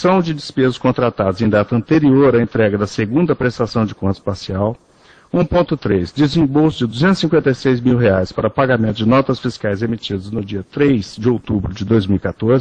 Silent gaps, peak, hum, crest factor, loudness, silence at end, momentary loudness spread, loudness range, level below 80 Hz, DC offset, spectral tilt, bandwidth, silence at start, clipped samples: none; 0 dBFS; none; 16 dB; -16 LUFS; 0 s; 7 LU; 3 LU; -40 dBFS; under 0.1%; -7.5 dB/octave; 9.2 kHz; 0 s; under 0.1%